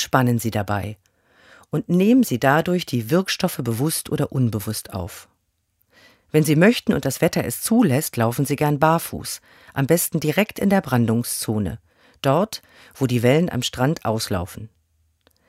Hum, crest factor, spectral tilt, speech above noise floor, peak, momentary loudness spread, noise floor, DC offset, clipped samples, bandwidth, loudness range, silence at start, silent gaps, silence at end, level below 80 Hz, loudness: none; 20 dB; -5.5 dB/octave; 48 dB; 0 dBFS; 13 LU; -69 dBFS; under 0.1%; under 0.1%; 16 kHz; 3 LU; 0 s; none; 0.8 s; -52 dBFS; -21 LUFS